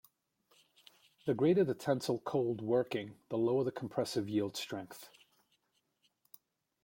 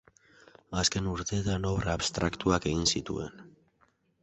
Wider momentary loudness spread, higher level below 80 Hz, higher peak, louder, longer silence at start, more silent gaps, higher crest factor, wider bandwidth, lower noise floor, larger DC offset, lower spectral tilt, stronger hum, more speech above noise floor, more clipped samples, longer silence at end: about the same, 12 LU vs 10 LU; second, -76 dBFS vs -46 dBFS; second, -18 dBFS vs -10 dBFS; second, -35 LUFS vs -30 LUFS; first, 1.25 s vs 0.7 s; neither; about the same, 18 dB vs 22 dB; first, 16.5 kHz vs 8.2 kHz; first, -79 dBFS vs -69 dBFS; neither; first, -6 dB/octave vs -4 dB/octave; neither; first, 45 dB vs 39 dB; neither; first, 1.75 s vs 0.75 s